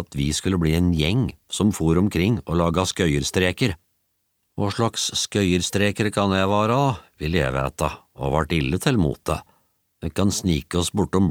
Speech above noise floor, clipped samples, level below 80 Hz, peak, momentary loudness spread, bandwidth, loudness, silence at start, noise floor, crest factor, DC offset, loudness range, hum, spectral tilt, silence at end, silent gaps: 50 dB; under 0.1%; -38 dBFS; -4 dBFS; 8 LU; 18 kHz; -22 LUFS; 0 s; -72 dBFS; 18 dB; under 0.1%; 3 LU; none; -5 dB/octave; 0 s; none